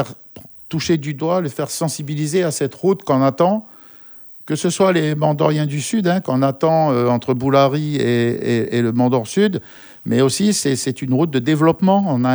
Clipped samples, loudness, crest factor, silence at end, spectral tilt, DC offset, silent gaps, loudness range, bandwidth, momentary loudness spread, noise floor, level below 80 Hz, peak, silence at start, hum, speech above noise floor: under 0.1%; -18 LUFS; 16 dB; 0 s; -6 dB/octave; under 0.1%; none; 3 LU; over 20 kHz; 9 LU; -41 dBFS; -58 dBFS; -2 dBFS; 0 s; none; 24 dB